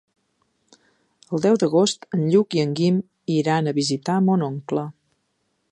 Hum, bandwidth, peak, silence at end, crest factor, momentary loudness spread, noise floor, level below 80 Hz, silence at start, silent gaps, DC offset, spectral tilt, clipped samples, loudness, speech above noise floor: none; 11 kHz; -6 dBFS; 0.8 s; 16 dB; 8 LU; -71 dBFS; -68 dBFS; 1.3 s; none; under 0.1%; -6 dB/octave; under 0.1%; -21 LUFS; 51 dB